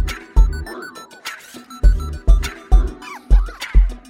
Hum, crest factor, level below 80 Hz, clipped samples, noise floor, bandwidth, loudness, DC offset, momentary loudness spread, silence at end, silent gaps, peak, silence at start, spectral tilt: none; 14 dB; -16 dBFS; under 0.1%; -37 dBFS; 11 kHz; -20 LUFS; under 0.1%; 14 LU; 0.1 s; none; -2 dBFS; 0 s; -5.5 dB/octave